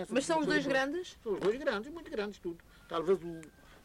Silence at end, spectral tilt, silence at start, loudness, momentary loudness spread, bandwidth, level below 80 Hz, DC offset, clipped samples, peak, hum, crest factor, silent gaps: 0.05 s; -4.5 dB/octave; 0 s; -34 LUFS; 14 LU; 15.5 kHz; -62 dBFS; under 0.1%; under 0.1%; -18 dBFS; none; 16 dB; none